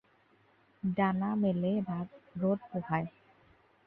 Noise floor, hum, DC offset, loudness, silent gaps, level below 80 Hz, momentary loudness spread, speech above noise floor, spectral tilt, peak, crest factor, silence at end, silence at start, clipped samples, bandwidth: -67 dBFS; none; under 0.1%; -33 LUFS; none; -70 dBFS; 9 LU; 35 dB; -11 dB/octave; -18 dBFS; 16 dB; 0.75 s; 0.85 s; under 0.1%; 4.1 kHz